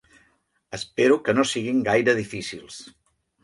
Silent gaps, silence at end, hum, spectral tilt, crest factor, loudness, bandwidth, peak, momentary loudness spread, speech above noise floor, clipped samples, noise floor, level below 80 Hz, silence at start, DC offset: none; 0.6 s; none; -4.5 dB/octave; 18 dB; -22 LUFS; 11.5 kHz; -6 dBFS; 18 LU; 43 dB; under 0.1%; -66 dBFS; -60 dBFS; 0.7 s; under 0.1%